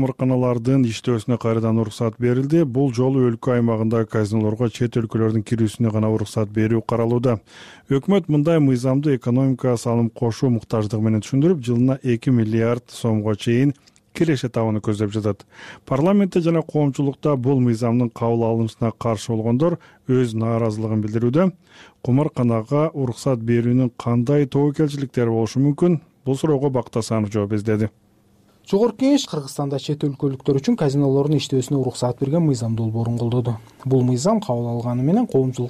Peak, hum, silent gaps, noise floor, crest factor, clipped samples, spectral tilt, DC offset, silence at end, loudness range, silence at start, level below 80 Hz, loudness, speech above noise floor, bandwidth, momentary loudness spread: -8 dBFS; none; none; -56 dBFS; 12 dB; under 0.1%; -7.5 dB/octave; under 0.1%; 0 s; 2 LU; 0 s; -54 dBFS; -20 LUFS; 37 dB; 12.5 kHz; 5 LU